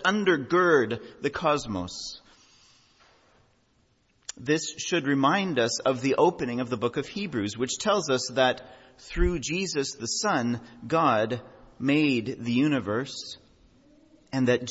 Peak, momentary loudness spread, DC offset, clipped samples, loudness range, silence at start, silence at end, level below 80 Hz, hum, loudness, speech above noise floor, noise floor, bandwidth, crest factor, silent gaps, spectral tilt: -8 dBFS; 13 LU; under 0.1%; under 0.1%; 7 LU; 0 s; 0 s; -44 dBFS; none; -26 LUFS; 41 dB; -67 dBFS; 8 kHz; 18 dB; none; -4.5 dB/octave